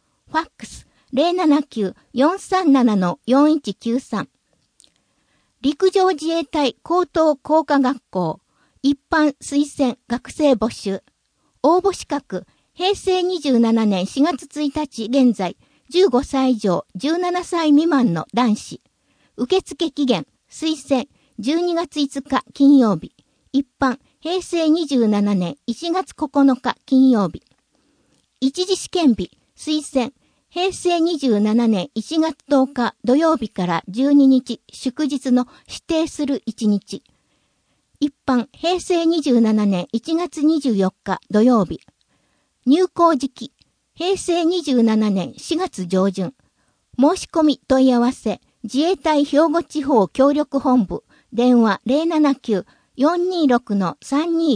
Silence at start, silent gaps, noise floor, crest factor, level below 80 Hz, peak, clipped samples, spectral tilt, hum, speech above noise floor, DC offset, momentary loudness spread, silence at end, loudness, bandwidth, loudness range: 0.35 s; none; -66 dBFS; 16 dB; -54 dBFS; -2 dBFS; under 0.1%; -5.5 dB/octave; none; 48 dB; under 0.1%; 11 LU; 0 s; -19 LUFS; 10.5 kHz; 4 LU